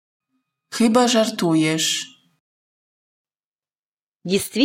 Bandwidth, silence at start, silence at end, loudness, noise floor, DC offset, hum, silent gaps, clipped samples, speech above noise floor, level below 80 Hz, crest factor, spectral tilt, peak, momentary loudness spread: 16.5 kHz; 0.7 s; 0 s; -19 LUFS; under -90 dBFS; under 0.1%; none; 2.40-3.25 s, 3.45-3.59 s, 3.79-4.20 s; under 0.1%; over 72 dB; -66 dBFS; 18 dB; -3.5 dB/octave; -4 dBFS; 16 LU